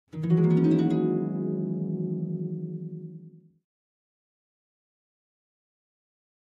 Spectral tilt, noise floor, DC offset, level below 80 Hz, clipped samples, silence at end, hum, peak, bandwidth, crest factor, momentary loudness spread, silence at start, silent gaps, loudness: -10.5 dB/octave; -49 dBFS; under 0.1%; -70 dBFS; under 0.1%; 3.2 s; none; -12 dBFS; 4.8 kHz; 18 dB; 17 LU; 0.15 s; none; -27 LUFS